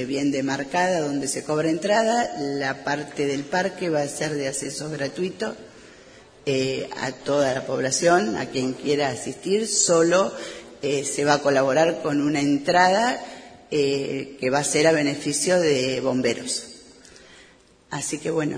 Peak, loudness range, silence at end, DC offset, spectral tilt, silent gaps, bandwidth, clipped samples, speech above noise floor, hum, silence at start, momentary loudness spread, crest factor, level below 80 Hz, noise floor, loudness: -2 dBFS; 6 LU; 0 s; under 0.1%; -3.5 dB/octave; none; 10.5 kHz; under 0.1%; 31 dB; none; 0 s; 11 LU; 20 dB; -60 dBFS; -53 dBFS; -23 LUFS